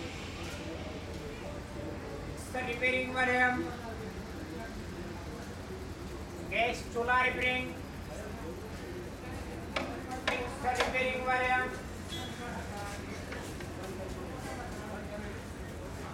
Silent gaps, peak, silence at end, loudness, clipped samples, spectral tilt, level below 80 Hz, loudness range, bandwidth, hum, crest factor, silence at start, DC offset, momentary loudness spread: none; -14 dBFS; 0 s; -35 LUFS; under 0.1%; -4.5 dB/octave; -50 dBFS; 7 LU; 16 kHz; none; 22 dB; 0 s; under 0.1%; 14 LU